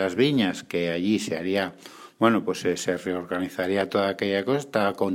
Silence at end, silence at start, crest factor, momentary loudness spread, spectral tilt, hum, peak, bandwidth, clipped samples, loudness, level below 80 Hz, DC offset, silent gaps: 0 s; 0 s; 20 dB; 7 LU; -5 dB/octave; none; -4 dBFS; 16 kHz; under 0.1%; -25 LUFS; -66 dBFS; under 0.1%; none